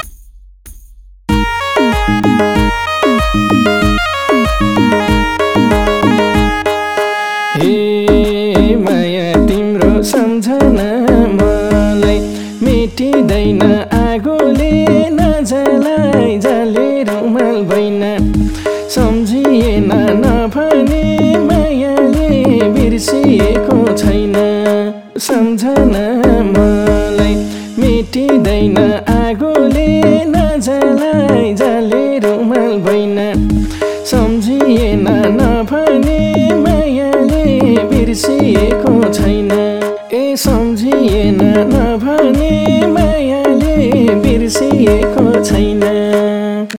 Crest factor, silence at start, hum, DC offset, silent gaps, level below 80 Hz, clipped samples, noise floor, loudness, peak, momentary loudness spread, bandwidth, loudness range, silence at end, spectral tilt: 10 dB; 0 s; none; under 0.1%; none; -22 dBFS; under 0.1%; -37 dBFS; -11 LUFS; 0 dBFS; 4 LU; 17 kHz; 1 LU; 0 s; -6 dB/octave